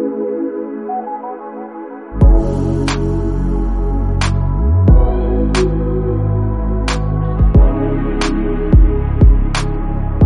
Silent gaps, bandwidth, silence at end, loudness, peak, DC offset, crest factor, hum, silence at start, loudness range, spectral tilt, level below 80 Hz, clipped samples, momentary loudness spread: none; 10.5 kHz; 0 s; -16 LUFS; 0 dBFS; under 0.1%; 12 dB; none; 0 s; 3 LU; -7.5 dB/octave; -16 dBFS; under 0.1%; 11 LU